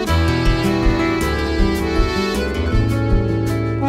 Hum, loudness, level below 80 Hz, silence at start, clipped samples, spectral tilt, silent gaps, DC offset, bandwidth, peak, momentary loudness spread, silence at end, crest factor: none; -18 LUFS; -22 dBFS; 0 s; under 0.1%; -6.5 dB/octave; none; under 0.1%; 16 kHz; -4 dBFS; 2 LU; 0 s; 12 dB